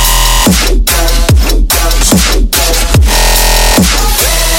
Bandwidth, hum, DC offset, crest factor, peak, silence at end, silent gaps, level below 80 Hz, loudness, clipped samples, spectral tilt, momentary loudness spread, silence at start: 17.5 kHz; none; under 0.1%; 8 dB; 0 dBFS; 0 s; none; -10 dBFS; -8 LUFS; 0.4%; -3 dB/octave; 2 LU; 0 s